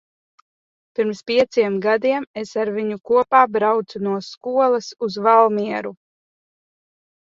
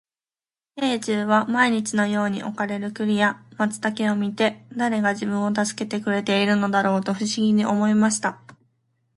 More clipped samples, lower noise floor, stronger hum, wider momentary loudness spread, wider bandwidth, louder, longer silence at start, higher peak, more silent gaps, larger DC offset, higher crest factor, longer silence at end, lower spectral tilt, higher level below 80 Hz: neither; about the same, under -90 dBFS vs under -90 dBFS; neither; first, 12 LU vs 7 LU; second, 7.6 kHz vs 11.5 kHz; first, -19 LUFS vs -22 LUFS; first, 1 s vs 0.75 s; first, 0 dBFS vs -4 dBFS; first, 2.27-2.34 s, 4.37-4.41 s vs none; neither; about the same, 20 dB vs 18 dB; first, 1.35 s vs 0.8 s; about the same, -5.5 dB/octave vs -4.5 dB/octave; about the same, -66 dBFS vs -66 dBFS